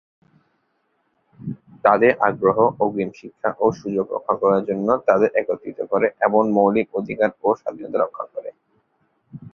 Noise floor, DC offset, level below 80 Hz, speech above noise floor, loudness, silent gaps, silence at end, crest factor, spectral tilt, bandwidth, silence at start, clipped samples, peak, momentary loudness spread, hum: -69 dBFS; under 0.1%; -62 dBFS; 49 dB; -20 LUFS; none; 0.05 s; 20 dB; -8.5 dB/octave; 6.6 kHz; 1.4 s; under 0.1%; -2 dBFS; 14 LU; none